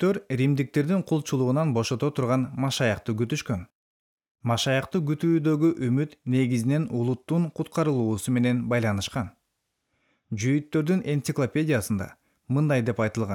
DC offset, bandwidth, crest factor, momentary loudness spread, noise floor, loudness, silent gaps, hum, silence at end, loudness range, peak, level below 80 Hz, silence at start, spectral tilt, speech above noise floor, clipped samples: under 0.1%; 17 kHz; 14 dB; 6 LU; -78 dBFS; -26 LUFS; 3.75-4.18 s, 4.31-4.35 s; none; 0 s; 3 LU; -12 dBFS; -62 dBFS; 0 s; -6.5 dB/octave; 54 dB; under 0.1%